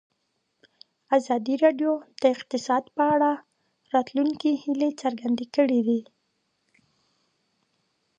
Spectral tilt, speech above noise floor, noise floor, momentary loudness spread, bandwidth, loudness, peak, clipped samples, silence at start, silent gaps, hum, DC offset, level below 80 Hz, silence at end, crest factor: -5 dB/octave; 52 dB; -75 dBFS; 6 LU; 9.4 kHz; -25 LUFS; -8 dBFS; under 0.1%; 1.1 s; none; none; under 0.1%; -76 dBFS; 2.15 s; 20 dB